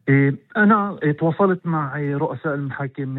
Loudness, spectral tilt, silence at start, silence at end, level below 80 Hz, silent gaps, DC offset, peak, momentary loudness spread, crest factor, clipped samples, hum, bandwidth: -20 LUFS; -11.5 dB/octave; 0.05 s; 0 s; -62 dBFS; none; under 0.1%; -4 dBFS; 9 LU; 16 dB; under 0.1%; none; 4.1 kHz